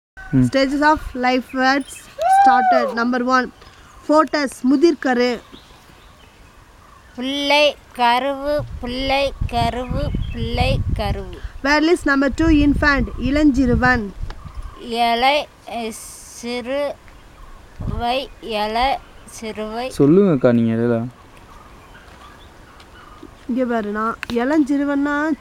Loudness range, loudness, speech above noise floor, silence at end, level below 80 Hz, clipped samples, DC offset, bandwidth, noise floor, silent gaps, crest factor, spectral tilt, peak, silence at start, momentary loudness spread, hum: 8 LU; -18 LUFS; 28 dB; 0.2 s; -34 dBFS; under 0.1%; under 0.1%; 15 kHz; -46 dBFS; none; 18 dB; -5.5 dB/octave; -2 dBFS; 0.15 s; 15 LU; none